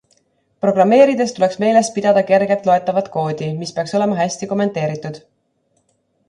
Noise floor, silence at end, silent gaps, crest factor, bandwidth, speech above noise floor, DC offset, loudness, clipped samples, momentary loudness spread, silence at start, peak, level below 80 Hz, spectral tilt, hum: -65 dBFS; 1.1 s; none; 16 dB; 11 kHz; 49 dB; under 0.1%; -16 LUFS; under 0.1%; 11 LU; 0.65 s; 0 dBFS; -62 dBFS; -5.5 dB/octave; none